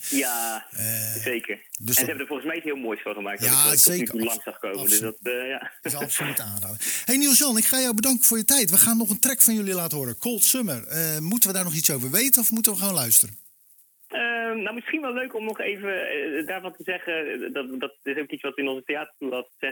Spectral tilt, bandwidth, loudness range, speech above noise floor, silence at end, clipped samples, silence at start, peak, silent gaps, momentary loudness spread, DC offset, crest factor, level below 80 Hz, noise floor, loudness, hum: -2 dB/octave; 19.5 kHz; 11 LU; 33 dB; 0 s; under 0.1%; 0 s; 0 dBFS; none; 15 LU; under 0.1%; 24 dB; -68 dBFS; -57 dBFS; -21 LUFS; none